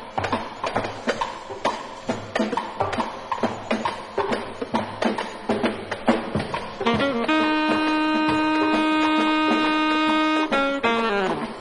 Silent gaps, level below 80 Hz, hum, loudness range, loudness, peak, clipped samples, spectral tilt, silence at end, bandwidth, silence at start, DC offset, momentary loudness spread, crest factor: none; -52 dBFS; none; 7 LU; -23 LUFS; -6 dBFS; under 0.1%; -5 dB/octave; 0 s; 11 kHz; 0 s; under 0.1%; 8 LU; 18 dB